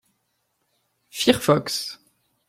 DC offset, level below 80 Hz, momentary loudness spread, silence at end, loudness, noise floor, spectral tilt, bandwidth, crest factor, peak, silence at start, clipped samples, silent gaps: under 0.1%; -58 dBFS; 18 LU; 0.55 s; -22 LUFS; -73 dBFS; -4 dB/octave; 16.5 kHz; 24 dB; -2 dBFS; 1.15 s; under 0.1%; none